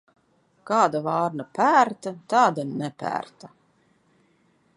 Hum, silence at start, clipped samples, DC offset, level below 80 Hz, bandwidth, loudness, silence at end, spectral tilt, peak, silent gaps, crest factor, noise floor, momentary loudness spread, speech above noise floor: none; 0.65 s; under 0.1%; under 0.1%; -74 dBFS; 11.5 kHz; -23 LUFS; 1.3 s; -5.5 dB/octave; -4 dBFS; none; 20 dB; -64 dBFS; 12 LU; 41 dB